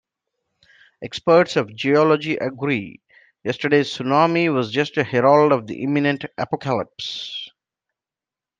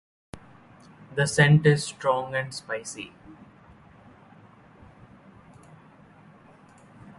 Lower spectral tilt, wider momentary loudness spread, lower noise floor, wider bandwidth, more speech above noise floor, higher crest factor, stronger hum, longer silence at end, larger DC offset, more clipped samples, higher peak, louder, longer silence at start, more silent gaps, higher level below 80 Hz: about the same, -6 dB/octave vs -5.5 dB/octave; second, 14 LU vs 29 LU; first, -89 dBFS vs -53 dBFS; second, 9.2 kHz vs 11.5 kHz; first, 70 dB vs 29 dB; second, 18 dB vs 24 dB; neither; second, 1.1 s vs 3.75 s; neither; neither; about the same, -2 dBFS vs -4 dBFS; first, -20 LUFS vs -24 LUFS; first, 1 s vs 0.35 s; neither; second, -66 dBFS vs -60 dBFS